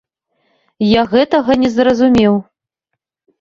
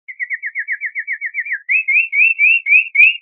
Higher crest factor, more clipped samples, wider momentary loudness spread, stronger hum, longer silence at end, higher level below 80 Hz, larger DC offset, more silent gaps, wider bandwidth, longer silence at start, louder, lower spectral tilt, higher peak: about the same, 14 dB vs 16 dB; neither; second, 5 LU vs 13 LU; neither; first, 1 s vs 0.05 s; first, -44 dBFS vs under -90 dBFS; neither; neither; first, 7.4 kHz vs 4.2 kHz; first, 0.8 s vs 0.1 s; about the same, -13 LUFS vs -13 LUFS; first, -6.5 dB/octave vs 8.5 dB/octave; about the same, -2 dBFS vs 0 dBFS